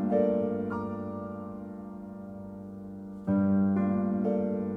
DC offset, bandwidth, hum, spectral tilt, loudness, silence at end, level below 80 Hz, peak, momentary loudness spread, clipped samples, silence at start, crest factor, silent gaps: under 0.1%; 3.2 kHz; none; -11.5 dB/octave; -29 LUFS; 0 s; -62 dBFS; -14 dBFS; 16 LU; under 0.1%; 0 s; 16 dB; none